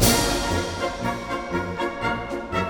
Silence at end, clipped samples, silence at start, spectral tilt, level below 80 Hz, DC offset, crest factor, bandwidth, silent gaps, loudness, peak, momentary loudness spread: 0 s; under 0.1%; 0 s; -3.5 dB/octave; -36 dBFS; under 0.1%; 20 dB; 18 kHz; none; -25 LUFS; -4 dBFS; 7 LU